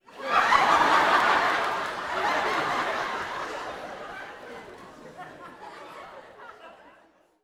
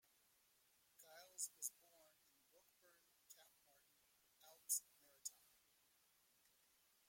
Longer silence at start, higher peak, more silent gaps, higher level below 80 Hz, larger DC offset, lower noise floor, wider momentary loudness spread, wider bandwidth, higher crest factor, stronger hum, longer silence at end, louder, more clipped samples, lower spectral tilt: second, 0.1 s vs 1 s; first, -6 dBFS vs -28 dBFS; neither; first, -60 dBFS vs under -90 dBFS; neither; second, -60 dBFS vs -79 dBFS; about the same, 25 LU vs 23 LU; about the same, 17 kHz vs 16.5 kHz; second, 22 dB vs 30 dB; neither; second, 0.7 s vs 1.75 s; first, -24 LUFS vs -49 LUFS; neither; first, -2.5 dB/octave vs 2.5 dB/octave